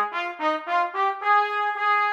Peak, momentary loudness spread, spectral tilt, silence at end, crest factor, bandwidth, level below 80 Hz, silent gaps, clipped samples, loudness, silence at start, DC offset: -10 dBFS; 5 LU; -2 dB/octave; 0 s; 12 dB; 8.2 kHz; -80 dBFS; none; under 0.1%; -23 LUFS; 0 s; under 0.1%